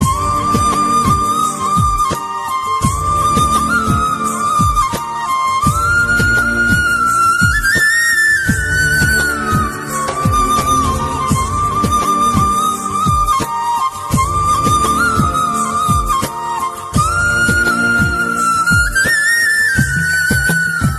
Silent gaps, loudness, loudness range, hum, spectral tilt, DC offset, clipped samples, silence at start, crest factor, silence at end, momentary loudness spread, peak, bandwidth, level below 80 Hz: none; -13 LUFS; 3 LU; none; -3.5 dB/octave; under 0.1%; under 0.1%; 0 s; 14 dB; 0 s; 6 LU; 0 dBFS; 13.5 kHz; -28 dBFS